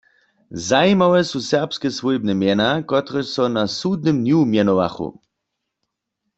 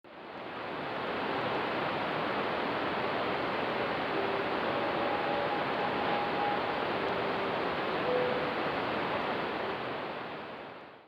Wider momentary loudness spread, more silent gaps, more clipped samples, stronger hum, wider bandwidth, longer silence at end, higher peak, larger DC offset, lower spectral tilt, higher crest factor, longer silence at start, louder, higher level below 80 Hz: about the same, 9 LU vs 8 LU; neither; neither; neither; second, 8.2 kHz vs over 20 kHz; first, 1.25 s vs 0 s; first, -2 dBFS vs -18 dBFS; neither; about the same, -5.5 dB/octave vs -6.5 dB/octave; about the same, 16 dB vs 16 dB; first, 0.5 s vs 0.05 s; first, -18 LUFS vs -32 LUFS; first, -56 dBFS vs -66 dBFS